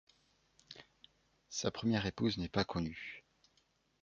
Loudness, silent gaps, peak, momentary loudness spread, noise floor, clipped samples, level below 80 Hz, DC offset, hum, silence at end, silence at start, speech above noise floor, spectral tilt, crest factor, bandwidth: -38 LUFS; none; -18 dBFS; 20 LU; -76 dBFS; under 0.1%; -60 dBFS; under 0.1%; none; 0.8 s; 0.7 s; 39 dB; -5 dB/octave; 24 dB; 7.6 kHz